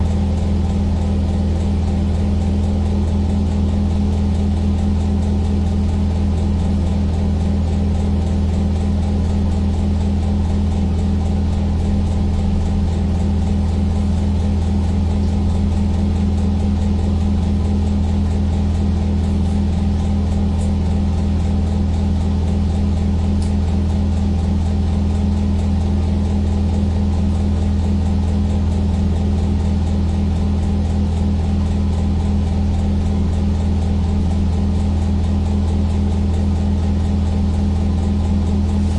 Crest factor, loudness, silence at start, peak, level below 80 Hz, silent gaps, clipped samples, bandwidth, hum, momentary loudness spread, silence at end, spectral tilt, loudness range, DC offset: 10 dB; -18 LUFS; 0 s; -6 dBFS; -24 dBFS; none; under 0.1%; 9 kHz; none; 1 LU; 0 s; -8.5 dB/octave; 0 LU; under 0.1%